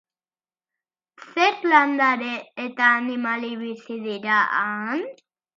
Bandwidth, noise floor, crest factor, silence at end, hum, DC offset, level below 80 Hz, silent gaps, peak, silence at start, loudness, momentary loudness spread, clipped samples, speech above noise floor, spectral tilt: 7.4 kHz; under -90 dBFS; 22 dB; 0.45 s; none; under 0.1%; -82 dBFS; none; -2 dBFS; 1.2 s; -22 LUFS; 14 LU; under 0.1%; over 68 dB; -4 dB/octave